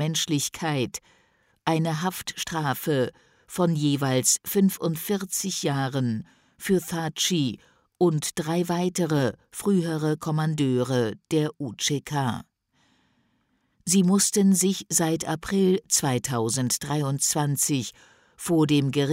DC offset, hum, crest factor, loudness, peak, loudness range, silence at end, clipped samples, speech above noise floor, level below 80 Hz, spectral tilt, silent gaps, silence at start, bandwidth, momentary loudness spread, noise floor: under 0.1%; none; 18 dB; -25 LUFS; -8 dBFS; 5 LU; 0 s; under 0.1%; 45 dB; -60 dBFS; -4.5 dB/octave; none; 0 s; 16 kHz; 9 LU; -70 dBFS